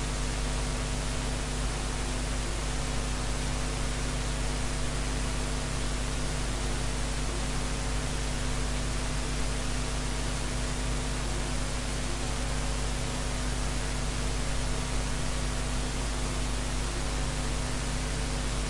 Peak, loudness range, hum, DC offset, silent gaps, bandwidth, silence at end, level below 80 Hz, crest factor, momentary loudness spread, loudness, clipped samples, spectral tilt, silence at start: -18 dBFS; 0 LU; none; under 0.1%; none; 11.5 kHz; 0 s; -32 dBFS; 12 dB; 0 LU; -32 LUFS; under 0.1%; -4 dB/octave; 0 s